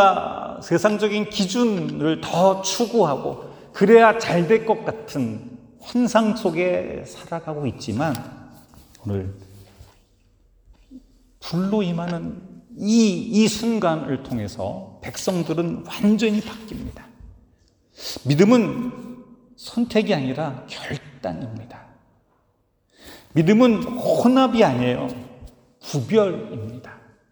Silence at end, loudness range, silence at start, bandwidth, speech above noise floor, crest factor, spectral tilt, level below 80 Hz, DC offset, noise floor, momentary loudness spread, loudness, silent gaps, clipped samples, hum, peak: 0.35 s; 11 LU; 0 s; over 20 kHz; 45 dB; 22 dB; -5.5 dB/octave; -54 dBFS; under 0.1%; -66 dBFS; 19 LU; -21 LUFS; none; under 0.1%; none; 0 dBFS